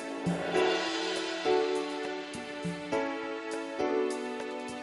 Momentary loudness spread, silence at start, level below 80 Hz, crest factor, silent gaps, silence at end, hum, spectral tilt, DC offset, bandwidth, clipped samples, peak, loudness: 9 LU; 0 s; -68 dBFS; 16 dB; none; 0 s; none; -4.5 dB/octave; under 0.1%; 11.5 kHz; under 0.1%; -16 dBFS; -32 LUFS